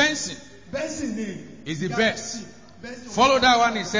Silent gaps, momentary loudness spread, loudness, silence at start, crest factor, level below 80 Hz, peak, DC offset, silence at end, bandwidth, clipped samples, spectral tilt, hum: none; 22 LU; -22 LUFS; 0 s; 18 dB; -52 dBFS; -6 dBFS; 0.3%; 0 s; 7.6 kHz; under 0.1%; -3 dB/octave; none